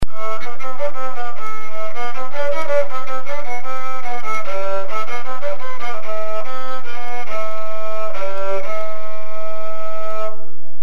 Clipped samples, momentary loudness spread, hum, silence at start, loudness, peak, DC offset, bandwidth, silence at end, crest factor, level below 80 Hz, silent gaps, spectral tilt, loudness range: under 0.1%; 6 LU; none; 0 s; -27 LUFS; -2 dBFS; 50%; 13.5 kHz; 0 s; 20 dB; -44 dBFS; none; -5 dB/octave; 3 LU